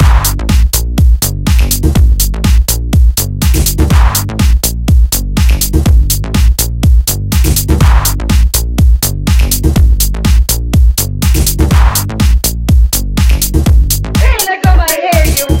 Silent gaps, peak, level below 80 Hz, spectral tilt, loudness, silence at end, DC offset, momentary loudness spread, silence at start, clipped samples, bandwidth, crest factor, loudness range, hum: none; 0 dBFS; -10 dBFS; -4.5 dB/octave; -10 LUFS; 0 s; under 0.1%; 3 LU; 0 s; 0.5%; 17.5 kHz; 8 dB; 0 LU; none